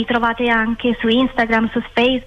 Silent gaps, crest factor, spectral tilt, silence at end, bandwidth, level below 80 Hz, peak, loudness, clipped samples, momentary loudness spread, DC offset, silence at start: none; 12 dB; -6 dB/octave; 0 s; 7 kHz; -40 dBFS; -6 dBFS; -17 LUFS; under 0.1%; 3 LU; under 0.1%; 0 s